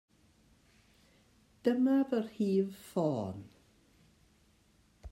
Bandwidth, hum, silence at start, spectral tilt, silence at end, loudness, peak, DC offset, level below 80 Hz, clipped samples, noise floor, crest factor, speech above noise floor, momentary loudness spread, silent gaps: 16 kHz; none; 1.65 s; -8 dB/octave; 0.05 s; -33 LUFS; -16 dBFS; under 0.1%; -70 dBFS; under 0.1%; -68 dBFS; 20 dB; 36 dB; 9 LU; none